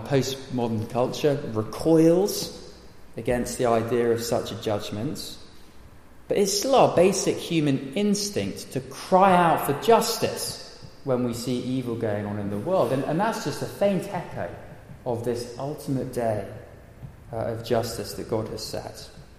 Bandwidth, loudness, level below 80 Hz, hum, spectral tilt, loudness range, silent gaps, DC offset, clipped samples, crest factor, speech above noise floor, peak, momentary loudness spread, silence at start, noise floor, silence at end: 15.5 kHz; -25 LUFS; -52 dBFS; none; -5 dB/octave; 7 LU; none; under 0.1%; under 0.1%; 20 dB; 22 dB; -4 dBFS; 17 LU; 0 s; -46 dBFS; 0.05 s